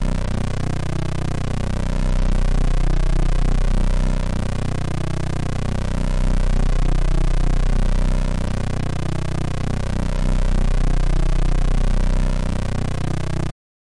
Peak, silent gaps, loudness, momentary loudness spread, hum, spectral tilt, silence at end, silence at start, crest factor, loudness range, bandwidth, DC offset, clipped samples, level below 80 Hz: -10 dBFS; none; -23 LUFS; 3 LU; none; -6.5 dB/octave; 0.45 s; 0 s; 6 dB; 1 LU; 11 kHz; under 0.1%; under 0.1%; -20 dBFS